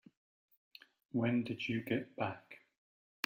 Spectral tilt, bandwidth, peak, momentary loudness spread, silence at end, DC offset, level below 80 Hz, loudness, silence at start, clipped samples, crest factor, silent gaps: -6.5 dB/octave; 16 kHz; -16 dBFS; 24 LU; 0.7 s; under 0.1%; -78 dBFS; -38 LUFS; 1.15 s; under 0.1%; 24 dB; none